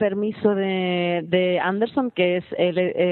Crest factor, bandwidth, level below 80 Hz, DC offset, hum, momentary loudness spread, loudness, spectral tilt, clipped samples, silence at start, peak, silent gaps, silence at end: 16 dB; 4.3 kHz; -66 dBFS; under 0.1%; none; 2 LU; -22 LUFS; -10.5 dB/octave; under 0.1%; 0 s; -6 dBFS; none; 0 s